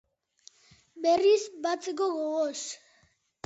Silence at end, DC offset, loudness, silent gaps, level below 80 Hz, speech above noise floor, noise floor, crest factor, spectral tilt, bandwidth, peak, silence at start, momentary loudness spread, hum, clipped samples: 0.7 s; under 0.1%; -28 LUFS; none; -76 dBFS; 40 dB; -67 dBFS; 16 dB; -2 dB/octave; 8 kHz; -14 dBFS; 0.95 s; 14 LU; none; under 0.1%